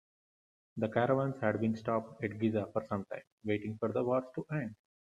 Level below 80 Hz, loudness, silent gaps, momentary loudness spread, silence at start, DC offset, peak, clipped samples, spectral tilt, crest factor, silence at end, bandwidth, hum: -72 dBFS; -35 LUFS; 3.32-3.38 s; 9 LU; 0.75 s; under 0.1%; -14 dBFS; under 0.1%; -8.5 dB/octave; 20 dB; 0.3 s; 7.8 kHz; none